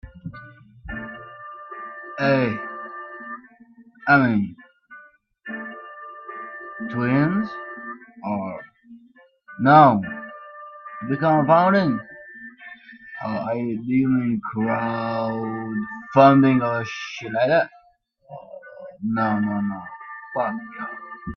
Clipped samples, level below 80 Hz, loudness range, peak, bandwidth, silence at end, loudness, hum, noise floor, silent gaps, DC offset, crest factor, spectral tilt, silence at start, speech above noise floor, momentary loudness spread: under 0.1%; -56 dBFS; 8 LU; -2 dBFS; 6.4 kHz; 0 s; -21 LUFS; none; -59 dBFS; none; under 0.1%; 22 dB; -8 dB/octave; 0.05 s; 40 dB; 23 LU